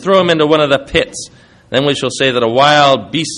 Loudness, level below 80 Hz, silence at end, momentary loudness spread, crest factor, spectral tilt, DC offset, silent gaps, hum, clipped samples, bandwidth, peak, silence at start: -12 LUFS; -42 dBFS; 0 s; 10 LU; 12 dB; -4 dB/octave; under 0.1%; none; none; under 0.1%; 11 kHz; 0 dBFS; 0 s